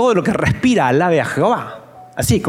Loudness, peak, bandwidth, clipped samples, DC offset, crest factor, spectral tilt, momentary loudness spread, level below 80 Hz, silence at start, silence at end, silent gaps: -16 LUFS; -4 dBFS; 16.5 kHz; under 0.1%; under 0.1%; 12 dB; -5.5 dB/octave; 17 LU; -42 dBFS; 0 s; 0 s; none